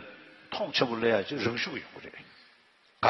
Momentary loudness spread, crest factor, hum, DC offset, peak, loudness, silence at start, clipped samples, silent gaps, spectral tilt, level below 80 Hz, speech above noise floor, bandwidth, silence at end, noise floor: 22 LU; 24 dB; none; under 0.1%; -8 dBFS; -30 LUFS; 0 s; under 0.1%; none; -5 dB/octave; -68 dBFS; 32 dB; 6.4 kHz; 0 s; -63 dBFS